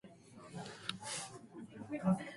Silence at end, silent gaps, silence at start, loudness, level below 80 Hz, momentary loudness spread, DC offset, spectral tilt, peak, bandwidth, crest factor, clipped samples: 0 s; none; 0.05 s; -43 LUFS; -74 dBFS; 17 LU; under 0.1%; -5 dB/octave; -22 dBFS; 11.5 kHz; 22 dB; under 0.1%